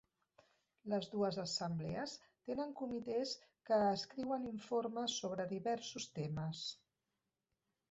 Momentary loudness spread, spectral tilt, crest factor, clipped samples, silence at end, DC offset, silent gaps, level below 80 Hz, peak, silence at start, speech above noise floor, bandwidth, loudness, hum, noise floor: 9 LU; -4.5 dB/octave; 16 dB; under 0.1%; 1.15 s; under 0.1%; none; -74 dBFS; -26 dBFS; 0.85 s; 49 dB; 8 kHz; -41 LUFS; none; -90 dBFS